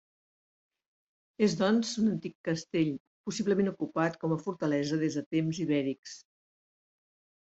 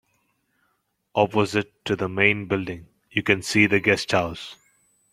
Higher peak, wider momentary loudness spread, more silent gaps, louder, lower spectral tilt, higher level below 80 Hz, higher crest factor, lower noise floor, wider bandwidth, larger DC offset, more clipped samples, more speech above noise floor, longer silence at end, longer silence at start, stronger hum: second, -14 dBFS vs 0 dBFS; second, 9 LU vs 14 LU; first, 2.35-2.44 s, 3.00-3.24 s, 5.26-5.31 s, 5.99-6.03 s vs none; second, -31 LUFS vs -22 LUFS; about the same, -6 dB/octave vs -5 dB/octave; second, -72 dBFS vs -58 dBFS; second, 18 dB vs 24 dB; first, under -90 dBFS vs -72 dBFS; second, 8.2 kHz vs 15 kHz; neither; neither; first, over 60 dB vs 49 dB; first, 1.35 s vs 0.6 s; first, 1.4 s vs 1.15 s; neither